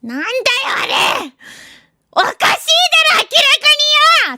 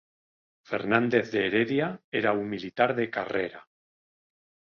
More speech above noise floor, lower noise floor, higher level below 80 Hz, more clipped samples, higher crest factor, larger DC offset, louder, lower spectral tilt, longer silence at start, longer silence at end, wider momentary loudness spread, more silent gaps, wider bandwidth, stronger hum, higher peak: second, 31 dB vs over 63 dB; second, -44 dBFS vs under -90 dBFS; first, -60 dBFS vs -66 dBFS; neither; second, 14 dB vs 22 dB; neither; first, -11 LUFS vs -27 LUFS; second, 0.5 dB/octave vs -7 dB/octave; second, 0.05 s vs 0.7 s; second, 0 s vs 1.15 s; about the same, 10 LU vs 9 LU; second, none vs 2.04-2.12 s; first, 19.5 kHz vs 7 kHz; neither; first, 0 dBFS vs -8 dBFS